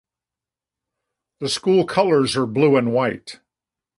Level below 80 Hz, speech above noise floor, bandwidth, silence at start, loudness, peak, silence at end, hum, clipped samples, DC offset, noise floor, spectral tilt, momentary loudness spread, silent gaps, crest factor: -60 dBFS; 70 dB; 11.5 kHz; 1.4 s; -19 LUFS; -2 dBFS; 0.65 s; none; under 0.1%; under 0.1%; -89 dBFS; -5.5 dB/octave; 12 LU; none; 18 dB